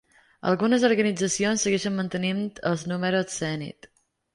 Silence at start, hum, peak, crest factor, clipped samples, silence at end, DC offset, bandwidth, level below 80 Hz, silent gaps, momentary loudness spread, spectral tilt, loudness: 0.45 s; none; -8 dBFS; 18 dB; under 0.1%; 0.65 s; under 0.1%; 11.5 kHz; -64 dBFS; none; 9 LU; -4.5 dB/octave; -25 LUFS